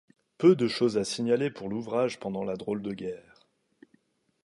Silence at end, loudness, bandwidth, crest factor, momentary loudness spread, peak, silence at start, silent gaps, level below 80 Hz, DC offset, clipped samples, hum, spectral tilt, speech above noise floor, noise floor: 1.25 s; -28 LUFS; 11.5 kHz; 20 dB; 13 LU; -8 dBFS; 0.4 s; none; -68 dBFS; under 0.1%; under 0.1%; none; -6 dB/octave; 41 dB; -68 dBFS